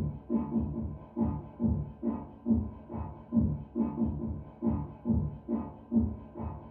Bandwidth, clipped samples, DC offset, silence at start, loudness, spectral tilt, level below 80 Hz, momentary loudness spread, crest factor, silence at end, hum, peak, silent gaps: 2.7 kHz; under 0.1%; under 0.1%; 0 s; -34 LUFS; -13 dB/octave; -44 dBFS; 9 LU; 16 dB; 0 s; none; -16 dBFS; none